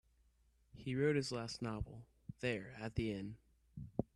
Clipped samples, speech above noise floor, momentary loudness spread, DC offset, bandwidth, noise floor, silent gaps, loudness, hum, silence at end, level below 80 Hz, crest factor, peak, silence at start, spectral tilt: under 0.1%; 34 dB; 19 LU; under 0.1%; 12 kHz; -74 dBFS; none; -42 LUFS; none; 0.1 s; -60 dBFS; 22 dB; -22 dBFS; 0.75 s; -6 dB/octave